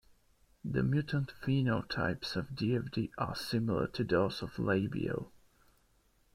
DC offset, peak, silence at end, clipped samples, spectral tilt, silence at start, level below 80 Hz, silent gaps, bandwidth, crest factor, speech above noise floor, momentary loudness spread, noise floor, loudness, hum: under 0.1%; -16 dBFS; 1.05 s; under 0.1%; -7 dB/octave; 0.65 s; -58 dBFS; none; 15 kHz; 18 dB; 37 dB; 6 LU; -70 dBFS; -34 LUFS; none